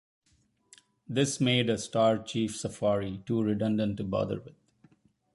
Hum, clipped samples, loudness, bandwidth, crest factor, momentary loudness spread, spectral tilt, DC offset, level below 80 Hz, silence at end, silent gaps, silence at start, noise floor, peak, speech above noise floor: none; under 0.1%; -29 LUFS; 11.5 kHz; 20 dB; 7 LU; -5 dB/octave; under 0.1%; -60 dBFS; 0.85 s; none; 1.1 s; -70 dBFS; -10 dBFS; 41 dB